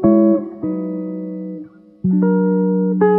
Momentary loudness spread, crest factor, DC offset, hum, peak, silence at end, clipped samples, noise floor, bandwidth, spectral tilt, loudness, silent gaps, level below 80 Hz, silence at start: 14 LU; 14 dB; under 0.1%; none; -2 dBFS; 0 s; under 0.1%; -36 dBFS; 2.4 kHz; -13.5 dB/octave; -18 LUFS; none; -54 dBFS; 0 s